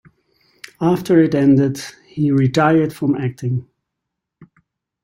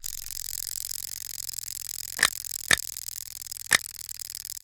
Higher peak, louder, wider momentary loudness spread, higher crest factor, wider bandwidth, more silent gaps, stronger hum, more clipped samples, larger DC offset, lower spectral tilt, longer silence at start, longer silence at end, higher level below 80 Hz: about the same, -2 dBFS vs 0 dBFS; first, -17 LUFS vs -28 LUFS; about the same, 10 LU vs 12 LU; second, 16 dB vs 30 dB; second, 16 kHz vs over 20 kHz; neither; neither; neither; neither; first, -7.5 dB/octave vs 1 dB/octave; first, 0.8 s vs 0 s; first, 0.6 s vs 0.05 s; about the same, -56 dBFS vs -56 dBFS